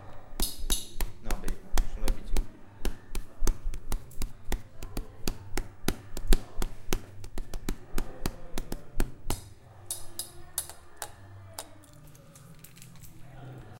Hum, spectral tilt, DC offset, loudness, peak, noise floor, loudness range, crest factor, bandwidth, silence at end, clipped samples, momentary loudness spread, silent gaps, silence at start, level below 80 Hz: none; -3.5 dB/octave; under 0.1%; -38 LUFS; -6 dBFS; -51 dBFS; 5 LU; 24 dB; 17 kHz; 0 s; under 0.1%; 17 LU; none; 0 s; -32 dBFS